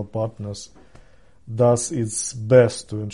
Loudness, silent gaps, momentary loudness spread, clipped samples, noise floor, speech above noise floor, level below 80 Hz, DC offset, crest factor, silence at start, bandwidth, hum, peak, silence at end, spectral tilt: -20 LUFS; none; 17 LU; under 0.1%; -52 dBFS; 31 dB; -54 dBFS; 0.3%; 18 dB; 0 s; 11.5 kHz; none; -2 dBFS; 0 s; -5.5 dB/octave